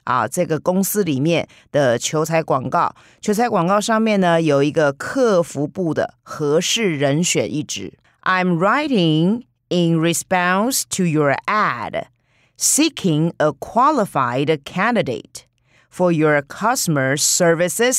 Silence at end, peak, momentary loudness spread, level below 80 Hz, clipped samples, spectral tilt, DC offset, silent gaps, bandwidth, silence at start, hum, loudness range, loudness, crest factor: 0 s; -6 dBFS; 8 LU; -60 dBFS; under 0.1%; -4 dB/octave; under 0.1%; none; 16 kHz; 0.05 s; none; 2 LU; -18 LUFS; 12 dB